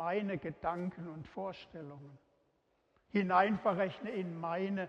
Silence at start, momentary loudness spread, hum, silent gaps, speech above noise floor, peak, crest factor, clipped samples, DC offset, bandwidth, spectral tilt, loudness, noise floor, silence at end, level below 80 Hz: 0 s; 19 LU; none; none; 40 dB; -16 dBFS; 22 dB; under 0.1%; under 0.1%; 6.6 kHz; -8 dB/octave; -36 LUFS; -76 dBFS; 0 s; -70 dBFS